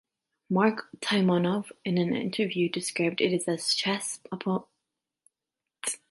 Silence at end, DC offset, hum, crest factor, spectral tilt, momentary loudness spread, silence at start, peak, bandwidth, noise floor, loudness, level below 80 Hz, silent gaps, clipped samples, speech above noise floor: 0.15 s; under 0.1%; none; 20 dB; -4.5 dB/octave; 9 LU; 0.5 s; -10 dBFS; 12 kHz; -88 dBFS; -28 LUFS; -74 dBFS; none; under 0.1%; 61 dB